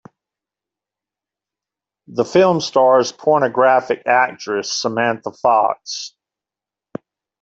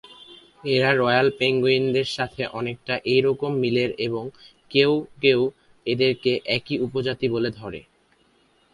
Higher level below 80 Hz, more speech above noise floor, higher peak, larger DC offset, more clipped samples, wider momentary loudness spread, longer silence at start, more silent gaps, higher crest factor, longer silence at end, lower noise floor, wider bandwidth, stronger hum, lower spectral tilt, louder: second, -64 dBFS vs -58 dBFS; first, 72 dB vs 39 dB; about the same, -2 dBFS vs -2 dBFS; neither; neither; first, 16 LU vs 10 LU; first, 2.1 s vs 0.1 s; neither; about the same, 16 dB vs 20 dB; first, 1.35 s vs 0.95 s; first, -88 dBFS vs -62 dBFS; second, 8 kHz vs 11 kHz; first, 50 Hz at -60 dBFS vs none; second, -4 dB/octave vs -6 dB/octave; first, -16 LUFS vs -22 LUFS